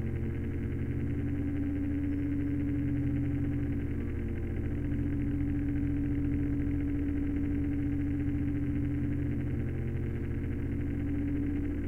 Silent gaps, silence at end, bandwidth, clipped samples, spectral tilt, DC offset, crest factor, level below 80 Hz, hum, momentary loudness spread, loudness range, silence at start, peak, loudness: none; 0 s; 3.2 kHz; under 0.1%; -10.5 dB/octave; under 0.1%; 12 dB; -42 dBFS; none; 3 LU; 1 LU; 0 s; -20 dBFS; -33 LUFS